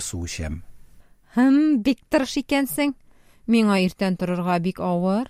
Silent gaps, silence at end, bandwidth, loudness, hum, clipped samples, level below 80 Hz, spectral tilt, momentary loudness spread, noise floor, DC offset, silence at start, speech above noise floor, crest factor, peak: none; 0 s; 16 kHz; -22 LUFS; none; under 0.1%; -46 dBFS; -5.5 dB/octave; 12 LU; -50 dBFS; under 0.1%; 0 s; 28 dB; 16 dB; -6 dBFS